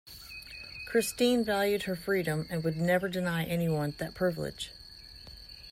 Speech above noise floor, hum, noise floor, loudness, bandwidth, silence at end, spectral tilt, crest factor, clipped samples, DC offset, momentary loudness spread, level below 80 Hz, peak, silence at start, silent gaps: 20 dB; none; -50 dBFS; -31 LUFS; 16 kHz; 0 s; -5 dB/octave; 16 dB; under 0.1%; under 0.1%; 19 LU; -56 dBFS; -14 dBFS; 0.05 s; none